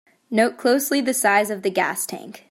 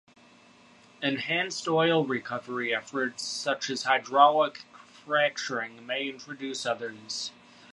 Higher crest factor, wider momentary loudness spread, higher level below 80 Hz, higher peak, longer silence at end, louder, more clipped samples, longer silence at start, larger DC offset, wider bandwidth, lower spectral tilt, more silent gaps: second, 18 dB vs 24 dB; second, 9 LU vs 13 LU; first, -72 dBFS vs -78 dBFS; about the same, -4 dBFS vs -6 dBFS; second, 0.15 s vs 0.4 s; first, -20 LUFS vs -28 LUFS; neither; second, 0.3 s vs 1 s; neither; first, 16.5 kHz vs 11.5 kHz; about the same, -3 dB/octave vs -3.5 dB/octave; neither